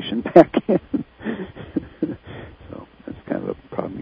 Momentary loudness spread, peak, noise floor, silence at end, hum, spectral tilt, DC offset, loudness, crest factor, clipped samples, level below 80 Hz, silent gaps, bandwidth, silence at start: 25 LU; 0 dBFS; -40 dBFS; 0 s; none; -8.5 dB/octave; under 0.1%; -21 LUFS; 22 dB; 0.1%; -50 dBFS; none; 6 kHz; 0 s